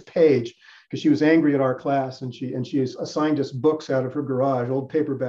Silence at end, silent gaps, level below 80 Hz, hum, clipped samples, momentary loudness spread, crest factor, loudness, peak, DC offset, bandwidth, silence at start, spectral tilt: 0 s; none; -70 dBFS; none; under 0.1%; 12 LU; 16 dB; -22 LUFS; -6 dBFS; under 0.1%; 7.4 kHz; 0.05 s; -7.5 dB/octave